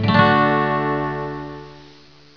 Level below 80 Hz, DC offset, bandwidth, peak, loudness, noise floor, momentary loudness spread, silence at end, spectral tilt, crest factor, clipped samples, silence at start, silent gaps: -46 dBFS; 0.3%; 5.4 kHz; 0 dBFS; -18 LUFS; -47 dBFS; 19 LU; 0.55 s; -8 dB/octave; 20 dB; under 0.1%; 0 s; none